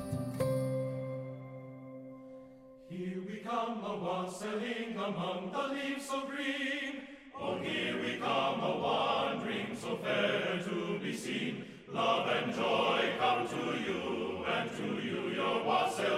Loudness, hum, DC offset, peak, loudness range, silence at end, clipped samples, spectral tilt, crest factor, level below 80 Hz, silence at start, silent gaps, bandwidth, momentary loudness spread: -34 LUFS; none; under 0.1%; -18 dBFS; 7 LU; 0 s; under 0.1%; -5 dB/octave; 16 dB; -70 dBFS; 0 s; none; 16 kHz; 14 LU